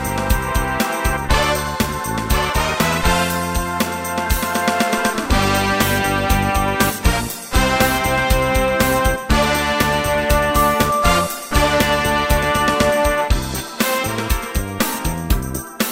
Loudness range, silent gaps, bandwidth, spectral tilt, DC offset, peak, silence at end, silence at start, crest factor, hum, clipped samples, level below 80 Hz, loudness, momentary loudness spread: 2 LU; none; 16.5 kHz; -4 dB/octave; under 0.1%; -2 dBFS; 0 s; 0 s; 16 dB; none; under 0.1%; -24 dBFS; -18 LUFS; 6 LU